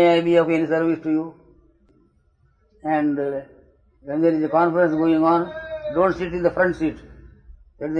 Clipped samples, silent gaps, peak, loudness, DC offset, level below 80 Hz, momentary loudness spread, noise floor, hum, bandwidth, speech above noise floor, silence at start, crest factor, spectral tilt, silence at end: under 0.1%; none; -4 dBFS; -21 LUFS; under 0.1%; -50 dBFS; 12 LU; -61 dBFS; none; 7.4 kHz; 41 dB; 0 s; 16 dB; -8 dB/octave; 0 s